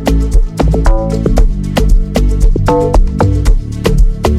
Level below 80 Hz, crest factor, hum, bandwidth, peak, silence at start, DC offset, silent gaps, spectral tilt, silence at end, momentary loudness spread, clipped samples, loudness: -10 dBFS; 8 dB; none; 13 kHz; 0 dBFS; 0 s; under 0.1%; none; -7 dB/octave; 0 s; 3 LU; under 0.1%; -13 LUFS